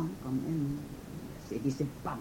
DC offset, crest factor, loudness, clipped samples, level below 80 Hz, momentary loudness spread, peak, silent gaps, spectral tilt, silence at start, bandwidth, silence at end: under 0.1%; 16 dB; -36 LUFS; under 0.1%; -54 dBFS; 11 LU; -20 dBFS; none; -7.5 dB/octave; 0 s; 17 kHz; 0 s